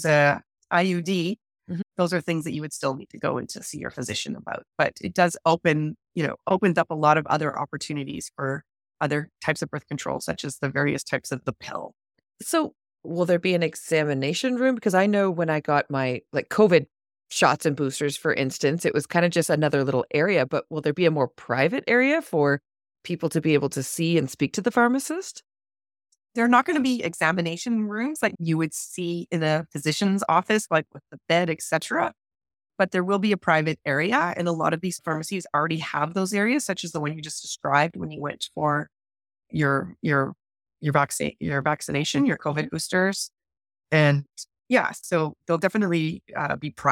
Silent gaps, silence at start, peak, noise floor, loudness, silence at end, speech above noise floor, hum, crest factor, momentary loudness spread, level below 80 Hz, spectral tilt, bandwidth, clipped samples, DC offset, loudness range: none; 0 s; -2 dBFS; under -90 dBFS; -24 LUFS; 0 s; over 66 dB; none; 22 dB; 10 LU; -64 dBFS; -5 dB/octave; 17 kHz; under 0.1%; under 0.1%; 5 LU